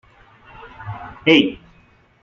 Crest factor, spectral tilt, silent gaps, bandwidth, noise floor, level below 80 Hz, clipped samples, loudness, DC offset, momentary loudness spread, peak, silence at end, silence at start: 20 dB; -6 dB/octave; none; 7.2 kHz; -54 dBFS; -52 dBFS; under 0.1%; -16 LUFS; under 0.1%; 22 LU; -2 dBFS; 0.7 s; 0.65 s